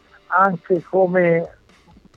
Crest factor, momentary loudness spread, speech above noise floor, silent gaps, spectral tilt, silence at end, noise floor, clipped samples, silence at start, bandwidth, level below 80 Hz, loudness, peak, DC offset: 16 dB; 6 LU; 33 dB; none; -9.5 dB/octave; 0.7 s; -50 dBFS; under 0.1%; 0.3 s; 6.4 kHz; -60 dBFS; -18 LUFS; -4 dBFS; under 0.1%